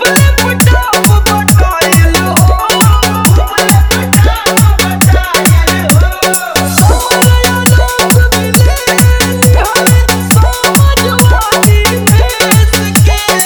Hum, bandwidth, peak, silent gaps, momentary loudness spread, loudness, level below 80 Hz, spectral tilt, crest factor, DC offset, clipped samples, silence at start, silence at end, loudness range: none; over 20 kHz; 0 dBFS; none; 1 LU; -7 LUFS; -12 dBFS; -4 dB/octave; 6 dB; under 0.1%; 2%; 0 s; 0 s; 1 LU